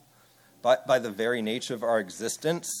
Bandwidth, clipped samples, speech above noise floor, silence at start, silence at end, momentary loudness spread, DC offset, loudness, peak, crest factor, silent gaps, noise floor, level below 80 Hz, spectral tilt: 18 kHz; under 0.1%; 32 dB; 0.65 s; 0 s; 7 LU; under 0.1%; -28 LUFS; -10 dBFS; 18 dB; none; -60 dBFS; -78 dBFS; -3.5 dB/octave